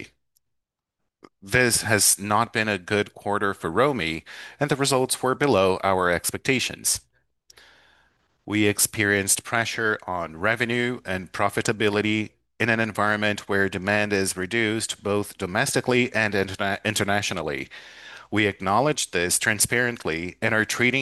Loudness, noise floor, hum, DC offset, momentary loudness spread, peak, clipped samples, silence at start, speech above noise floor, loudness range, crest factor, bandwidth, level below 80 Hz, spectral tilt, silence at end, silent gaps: -23 LUFS; -81 dBFS; none; under 0.1%; 8 LU; -4 dBFS; under 0.1%; 0 s; 57 dB; 2 LU; 22 dB; 13 kHz; -58 dBFS; -3 dB/octave; 0 s; none